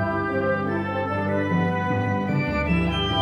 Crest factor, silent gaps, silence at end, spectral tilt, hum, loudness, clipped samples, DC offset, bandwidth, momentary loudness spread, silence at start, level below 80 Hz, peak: 12 dB; none; 0 s; -7.5 dB/octave; 50 Hz at -45 dBFS; -24 LUFS; under 0.1%; under 0.1%; 7.4 kHz; 3 LU; 0 s; -38 dBFS; -12 dBFS